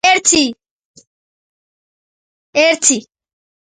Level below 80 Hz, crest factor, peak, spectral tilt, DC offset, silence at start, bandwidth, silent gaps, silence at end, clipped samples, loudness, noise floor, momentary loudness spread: -56 dBFS; 18 dB; 0 dBFS; -0.5 dB/octave; under 0.1%; 0.05 s; 11.5 kHz; 0.71-0.94 s, 1.07-2.53 s; 0.75 s; under 0.1%; -13 LUFS; under -90 dBFS; 10 LU